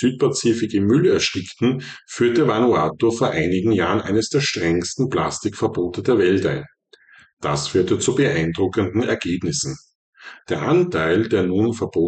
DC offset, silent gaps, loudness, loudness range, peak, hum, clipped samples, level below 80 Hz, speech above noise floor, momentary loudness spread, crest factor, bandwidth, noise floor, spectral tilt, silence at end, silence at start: under 0.1%; 7.33-7.37 s, 9.95-10.13 s; -20 LUFS; 3 LU; -8 dBFS; none; under 0.1%; -50 dBFS; 32 dB; 7 LU; 12 dB; 9.2 kHz; -51 dBFS; -5 dB/octave; 0 s; 0 s